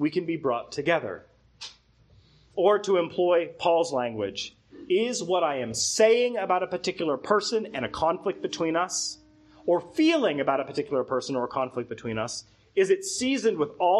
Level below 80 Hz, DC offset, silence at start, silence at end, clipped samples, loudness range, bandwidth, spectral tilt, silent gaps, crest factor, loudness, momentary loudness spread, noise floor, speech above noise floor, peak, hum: -64 dBFS; under 0.1%; 0 s; 0 s; under 0.1%; 3 LU; 12 kHz; -3.5 dB/octave; none; 20 dB; -26 LUFS; 11 LU; -59 dBFS; 33 dB; -8 dBFS; none